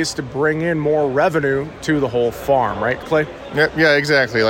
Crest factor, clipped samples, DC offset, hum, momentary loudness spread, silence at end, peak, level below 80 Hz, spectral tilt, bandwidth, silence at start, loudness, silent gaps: 14 dB; under 0.1%; under 0.1%; none; 6 LU; 0 s; -4 dBFS; -46 dBFS; -5 dB/octave; 16.5 kHz; 0 s; -18 LUFS; none